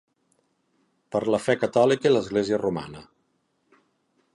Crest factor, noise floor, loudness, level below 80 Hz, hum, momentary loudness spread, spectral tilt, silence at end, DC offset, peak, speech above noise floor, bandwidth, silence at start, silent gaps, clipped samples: 20 dB; -71 dBFS; -23 LUFS; -62 dBFS; none; 13 LU; -5.5 dB/octave; 1.3 s; under 0.1%; -8 dBFS; 48 dB; 11.5 kHz; 1.1 s; none; under 0.1%